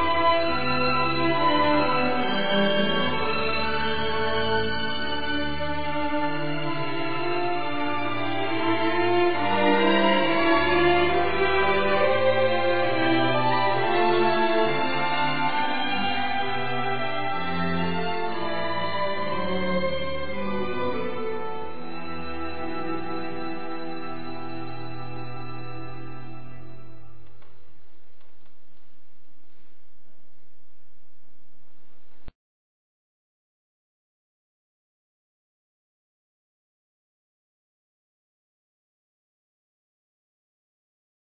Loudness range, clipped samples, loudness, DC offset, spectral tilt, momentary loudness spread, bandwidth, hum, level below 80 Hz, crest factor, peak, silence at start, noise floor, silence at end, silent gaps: 15 LU; under 0.1%; -24 LUFS; 5%; -9.5 dB/octave; 15 LU; 5 kHz; none; -50 dBFS; 20 dB; -6 dBFS; 0 s; -67 dBFS; 8.9 s; none